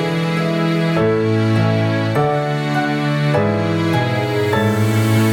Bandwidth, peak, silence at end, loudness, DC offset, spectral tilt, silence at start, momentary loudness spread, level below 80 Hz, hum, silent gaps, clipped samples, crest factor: 18 kHz; -2 dBFS; 0 s; -17 LUFS; under 0.1%; -7 dB/octave; 0 s; 3 LU; -48 dBFS; none; none; under 0.1%; 14 dB